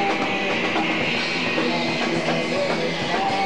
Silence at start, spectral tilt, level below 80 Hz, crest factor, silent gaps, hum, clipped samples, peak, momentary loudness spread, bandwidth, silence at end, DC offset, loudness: 0 s; -4 dB/octave; -58 dBFS; 12 dB; none; none; under 0.1%; -10 dBFS; 1 LU; 13.5 kHz; 0 s; 1%; -22 LUFS